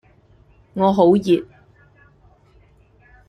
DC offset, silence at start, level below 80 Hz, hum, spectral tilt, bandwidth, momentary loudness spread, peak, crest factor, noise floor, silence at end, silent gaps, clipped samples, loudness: under 0.1%; 0.75 s; -54 dBFS; none; -8 dB/octave; 9.6 kHz; 8 LU; -2 dBFS; 20 dB; -53 dBFS; 1.85 s; none; under 0.1%; -17 LUFS